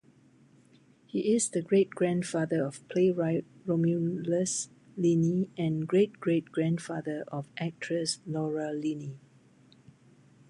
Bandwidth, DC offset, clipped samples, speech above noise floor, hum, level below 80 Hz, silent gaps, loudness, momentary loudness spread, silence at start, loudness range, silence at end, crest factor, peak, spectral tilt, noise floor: 11.5 kHz; under 0.1%; under 0.1%; 32 dB; none; -74 dBFS; none; -30 LUFS; 9 LU; 1.15 s; 5 LU; 1.3 s; 16 dB; -14 dBFS; -6 dB/octave; -61 dBFS